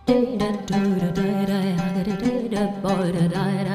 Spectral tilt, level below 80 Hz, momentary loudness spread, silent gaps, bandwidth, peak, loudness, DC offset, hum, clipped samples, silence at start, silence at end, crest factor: -7 dB/octave; -48 dBFS; 3 LU; none; 15 kHz; -6 dBFS; -23 LUFS; under 0.1%; none; under 0.1%; 0.05 s; 0 s; 14 dB